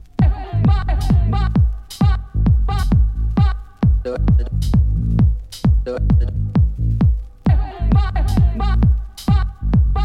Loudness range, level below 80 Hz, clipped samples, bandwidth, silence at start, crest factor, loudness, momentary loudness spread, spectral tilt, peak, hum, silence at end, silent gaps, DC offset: 1 LU; -18 dBFS; under 0.1%; 10.5 kHz; 0.2 s; 12 dB; -18 LUFS; 2 LU; -8 dB/octave; -4 dBFS; none; 0 s; none; under 0.1%